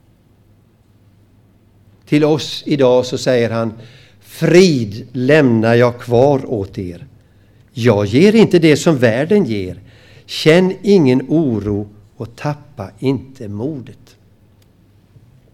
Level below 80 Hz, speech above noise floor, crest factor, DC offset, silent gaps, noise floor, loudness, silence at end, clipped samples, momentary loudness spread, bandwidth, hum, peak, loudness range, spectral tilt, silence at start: -50 dBFS; 37 dB; 16 dB; under 0.1%; none; -51 dBFS; -14 LUFS; 1.6 s; under 0.1%; 17 LU; 15 kHz; none; 0 dBFS; 8 LU; -6.5 dB/octave; 2.1 s